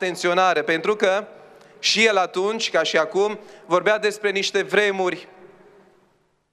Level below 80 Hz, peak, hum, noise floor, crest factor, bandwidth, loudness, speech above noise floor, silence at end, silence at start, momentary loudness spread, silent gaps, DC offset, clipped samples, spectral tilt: -76 dBFS; -4 dBFS; none; -63 dBFS; 18 dB; 13 kHz; -20 LUFS; 42 dB; 1.05 s; 0 s; 8 LU; none; under 0.1%; under 0.1%; -2.5 dB/octave